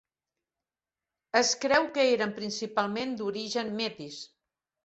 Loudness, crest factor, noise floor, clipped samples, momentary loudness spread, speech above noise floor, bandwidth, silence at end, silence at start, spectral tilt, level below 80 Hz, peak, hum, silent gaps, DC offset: -28 LUFS; 22 dB; under -90 dBFS; under 0.1%; 15 LU; over 61 dB; 8.2 kHz; 0.6 s; 1.35 s; -2.5 dB/octave; -72 dBFS; -8 dBFS; none; none; under 0.1%